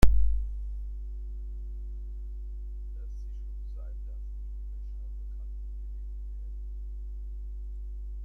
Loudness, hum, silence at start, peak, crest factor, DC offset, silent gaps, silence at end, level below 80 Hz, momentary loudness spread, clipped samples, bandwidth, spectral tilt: -39 LUFS; 50 Hz at -35 dBFS; 0 s; -4 dBFS; 24 dB; under 0.1%; none; 0 s; -34 dBFS; 4 LU; under 0.1%; 10 kHz; -7 dB/octave